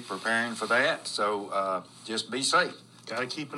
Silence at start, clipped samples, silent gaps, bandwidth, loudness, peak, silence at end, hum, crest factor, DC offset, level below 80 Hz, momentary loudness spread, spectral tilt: 0 s; under 0.1%; none; 14 kHz; -28 LUFS; -10 dBFS; 0 s; none; 20 dB; under 0.1%; -84 dBFS; 9 LU; -2 dB/octave